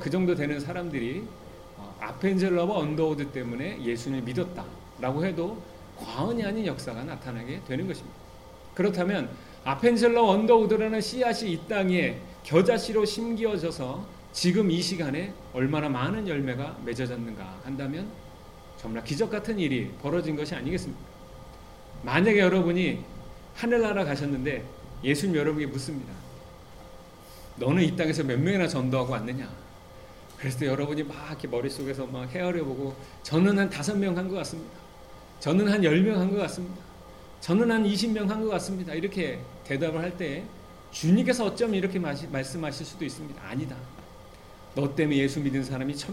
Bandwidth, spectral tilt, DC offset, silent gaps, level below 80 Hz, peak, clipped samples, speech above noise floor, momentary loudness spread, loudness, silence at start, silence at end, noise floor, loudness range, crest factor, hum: 15.5 kHz; -6 dB/octave; 0.1%; none; -52 dBFS; -8 dBFS; under 0.1%; 21 dB; 22 LU; -28 LUFS; 0 s; 0 s; -48 dBFS; 7 LU; 20 dB; none